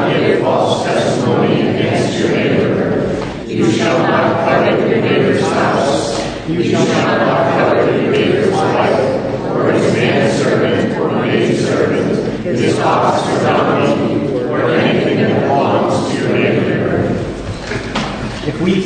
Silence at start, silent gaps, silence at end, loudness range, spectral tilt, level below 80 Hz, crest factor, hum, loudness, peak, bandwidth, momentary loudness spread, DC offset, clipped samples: 0 s; none; 0 s; 1 LU; -6 dB/octave; -40 dBFS; 12 dB; none; -14 LUFS; -2 dBFS; 9.6 kHz; 5 LU; under 0.1%; under 0.1%